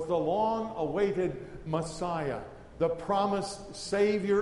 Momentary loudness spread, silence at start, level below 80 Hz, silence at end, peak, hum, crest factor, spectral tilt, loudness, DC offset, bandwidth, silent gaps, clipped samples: 11 LU; 0 s; -54 dBFS; 0 s; -16 dBFS; none; 14 dB; -6 dB/octave; -31 LUFS; under 0.1%; 11.5 kHz; none; under 0.1%